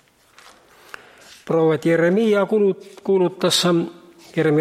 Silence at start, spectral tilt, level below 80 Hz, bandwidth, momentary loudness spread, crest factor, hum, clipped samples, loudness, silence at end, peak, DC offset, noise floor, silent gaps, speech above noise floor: 1.45 s; -5 dB/octave; -68 dBFS; 15.5 kHz; 12 LU; 16 dB; none; under 0.1%; -19 LUFS; 0 s; -4 dBFS; under 0.1%; -50 dBFS; none; 32 dB